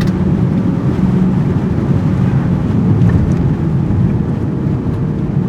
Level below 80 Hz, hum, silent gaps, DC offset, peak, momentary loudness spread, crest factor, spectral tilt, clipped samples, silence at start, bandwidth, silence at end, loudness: -28 dBFS; none; none; under 0.1%; 0 dBFS; 5 LU; 12 dB; -10 dB/octave; under 0.1%; 0 s; 7.4 kHz; 0 s; -14 LUFS